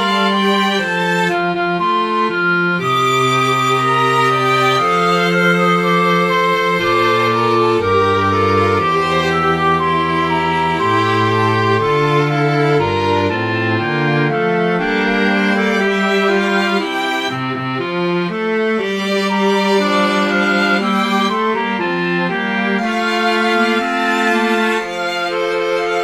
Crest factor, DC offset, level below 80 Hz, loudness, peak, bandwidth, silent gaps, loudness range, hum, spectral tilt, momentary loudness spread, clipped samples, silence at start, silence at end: 14 dB; under 0.1%; -50 dBFS; -15 LUFS; -2 dBFS; 15.5 kHz; none; 3 LU; none; -5.5 dB/octave; 4 LU; under 0.1%; 0 s; 0 s